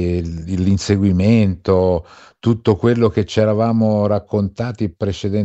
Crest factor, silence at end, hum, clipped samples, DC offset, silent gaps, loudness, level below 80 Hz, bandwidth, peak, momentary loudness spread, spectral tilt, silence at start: 14 dB; 0 s; none; under 0.1%; under 0.1%; none; -17 LUFS; -40 dBFS; 8.2 kHz; -2 dBFS; 8 LU; -7.5 dB/octave; 0 s